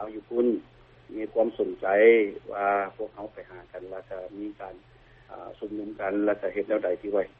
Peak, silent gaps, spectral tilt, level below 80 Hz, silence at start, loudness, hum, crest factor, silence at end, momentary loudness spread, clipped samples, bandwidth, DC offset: -6 dBFS; none; -4 dB/octave; -62 dBFS; 0 s; -26 LUFS; none; 20 dB; 0.1 s; 22 LU; under 0.1%; 4.1 kHz; under 0.1%